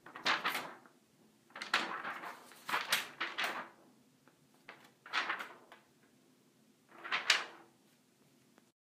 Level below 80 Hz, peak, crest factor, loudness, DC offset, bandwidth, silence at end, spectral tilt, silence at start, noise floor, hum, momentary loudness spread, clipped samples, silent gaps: under -90 dBFS; -10 dBFS; 32 dB; -37 LUFS; under 0.1%; 15.5 kHz; 1.25 s; 0 dB/octave; 0.05 s; -69 dBFS; none; 25 LU; under 0.1%; none